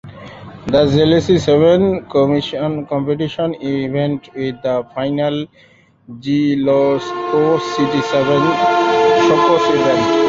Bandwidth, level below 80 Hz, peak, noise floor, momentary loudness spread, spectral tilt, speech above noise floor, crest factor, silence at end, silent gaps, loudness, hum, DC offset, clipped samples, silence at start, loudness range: 7.8 kHz; -46 dBFS; -2 dBFS; -34 dBFS; 10 LU; -6.5 dB/octave; 19 dB; 14 dB; 0 s; none; -15 LUFS; none; under 0.1%; under 0.1%; 0.05 s; 6 LU